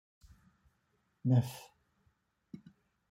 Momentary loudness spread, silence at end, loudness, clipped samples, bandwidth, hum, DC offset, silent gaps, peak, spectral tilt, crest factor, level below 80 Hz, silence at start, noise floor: 23 LU; 0.55 s; -33 LUFS; under 0.1%; 16 kHz; none; under 0.1%; none; -18 dBFS; -8 dB/octave; 22 dB; -72 dBFS; 1.25 s; -78 dBFS